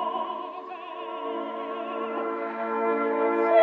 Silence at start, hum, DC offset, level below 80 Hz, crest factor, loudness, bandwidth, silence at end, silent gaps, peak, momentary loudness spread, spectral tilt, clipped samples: 0 s; none; under 0.1%; -84 dBFS; 18 dB; -29 LUFS; 5.4 kHz; 0 s; none; -10 dBFS; 12 LU; -6.5 dB/octave; under 0.1%